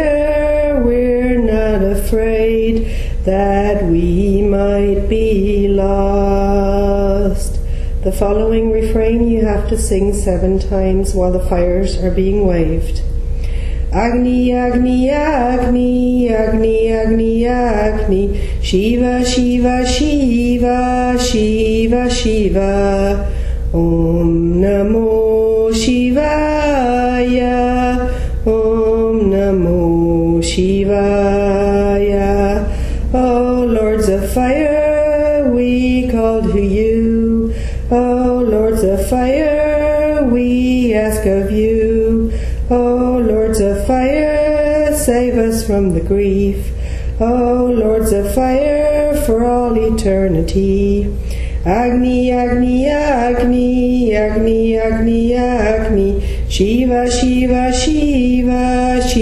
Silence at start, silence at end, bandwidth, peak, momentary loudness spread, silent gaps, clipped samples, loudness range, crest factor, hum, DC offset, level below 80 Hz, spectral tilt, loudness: 0 s; 0 s; 13.5 kHz; 0 dBFS; 4 LU; none; under 0.1%; 2 LU; 12 dB; none; under 0.1%; -20 dBFS; -6.5 dB/octave; -14 LUFS